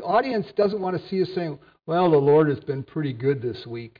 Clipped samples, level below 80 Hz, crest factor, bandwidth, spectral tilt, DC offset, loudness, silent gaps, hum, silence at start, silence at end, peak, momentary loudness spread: under 0.1%; -62 dBFS; 14 dB; 5.2 kHz; -9.5 dB/octave; under 0.1%; -23 LUFS; none; none; 0 s; 0.1 s; -10 dBFS; 12 LU